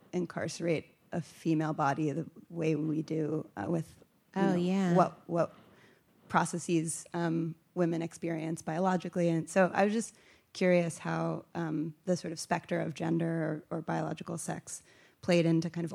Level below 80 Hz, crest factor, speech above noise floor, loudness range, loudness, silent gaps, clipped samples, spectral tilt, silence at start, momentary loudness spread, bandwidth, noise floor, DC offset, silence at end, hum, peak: -74 dBFS; 22 dB; 31 dB; 3 LU; -32 LUFS; none; under 0.1%; -6 dB/octave; 0.15 s; 10 LU; 13.5 kHz; -63 dBFS; under 0.1%; 0 s; none; -10 dBFS